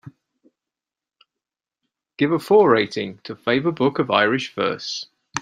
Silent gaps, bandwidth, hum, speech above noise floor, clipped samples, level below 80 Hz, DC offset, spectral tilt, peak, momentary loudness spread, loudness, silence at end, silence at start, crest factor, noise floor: none; 14.5 kHz; none; 69 dB; under 0.1%; -66 dBFS; under 0.1%; -5 dB/octave; -2 dBFS; 14 LU; -20 LUFS; 0 s; 0.05 s; 20 dB; -89 dBFS